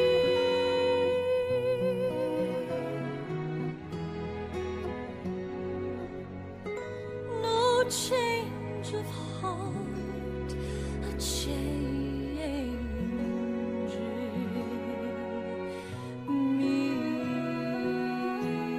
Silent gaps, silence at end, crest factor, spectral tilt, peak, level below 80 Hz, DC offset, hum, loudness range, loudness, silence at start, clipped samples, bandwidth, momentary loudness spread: none; 0 s; 16 dB; -5.5 dB/octave; -14 dBFS; -46 dBFS; under 0.1%; none; 6 LU; -32 LUFS; 0 s; under 0.1%; 15.5 kHz; 10 LU